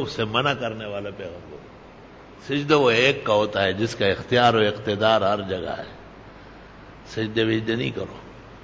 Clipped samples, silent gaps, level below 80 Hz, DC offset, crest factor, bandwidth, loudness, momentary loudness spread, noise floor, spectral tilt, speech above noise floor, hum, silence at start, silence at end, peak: under 0.1%; none; -50 dBFS; under 0.1%; 18 dB; 8 kHz; -22 LUFS; 22 LU; -45 dBFS; -5.5 dB/octave; 22 dB; none; 0 s; 0 s; -6 dBFS